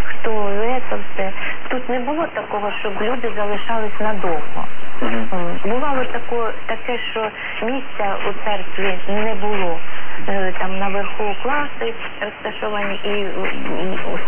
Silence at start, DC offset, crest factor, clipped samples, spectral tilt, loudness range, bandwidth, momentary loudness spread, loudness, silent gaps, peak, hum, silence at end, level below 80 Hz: 0 s; under 0.1%; 8 dB; under 0.1%; -8 dB/octave; 1 LU; 3.6 kHz; 4 LU; -23 LUFS; none; -4 dBFS; none; 0 s; -54 dBFS